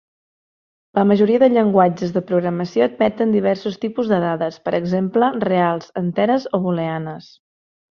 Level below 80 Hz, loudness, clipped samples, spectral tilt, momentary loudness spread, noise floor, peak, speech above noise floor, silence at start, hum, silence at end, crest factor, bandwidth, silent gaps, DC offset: -60 dBFS; -18 LUFS; under 0.1%; -8 dB/octave; 9 LU; under -90 dBFS; -2 dBFS; over 72 dB; 0.95 s; none; 0.7 s; 16 dB; 6.8 kHz; none; under 0.1%